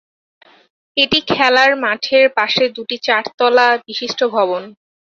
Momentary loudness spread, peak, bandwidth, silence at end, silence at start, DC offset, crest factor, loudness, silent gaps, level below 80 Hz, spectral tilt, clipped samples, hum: 8 LU; 0 dBFS; 7.4 kHz; 0.35 s; 0.95 s; under 0.1%; 16 dB; -14 LUFS; 3.34-3.38 s; -56 dBFS; -3 dB/octave; under 0.1%; none